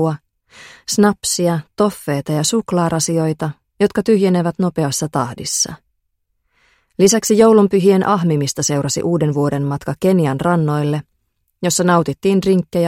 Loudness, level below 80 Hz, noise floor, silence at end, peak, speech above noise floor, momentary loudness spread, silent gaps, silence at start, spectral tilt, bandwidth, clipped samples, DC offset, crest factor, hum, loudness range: -16 LUFS; -52 dBFS; -69 dBFS; 0 s; -2 dBFS; 53 dB; 9 LU; none; 0 s; -5 dB/octave; 16.5 kHz; under 0.1%; under 0.1%; 16 dB; none; 4 LU